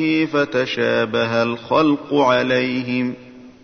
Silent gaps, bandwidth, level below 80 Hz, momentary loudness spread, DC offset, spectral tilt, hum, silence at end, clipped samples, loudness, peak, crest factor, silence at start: none; 6.6 kHz; -58 dBFS; 6 LU; under 0.1%; -6 dB/octave; none; 0.15 s; under 0.1%; -18 LUFS; -4 dBFS; 16 dB; 0 s